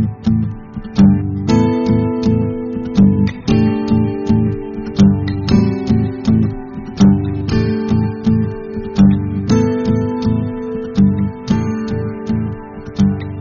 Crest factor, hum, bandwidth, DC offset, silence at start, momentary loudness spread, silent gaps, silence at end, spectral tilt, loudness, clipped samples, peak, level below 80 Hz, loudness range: 14 dB; none; 7.2 kHz; under 0.1%; 0 s; 10 LU; none; 0 s; -8.5 dB/octave; -15 LUFS; under 0.1%; -2 dBFS; -32 dBFS; 2 LU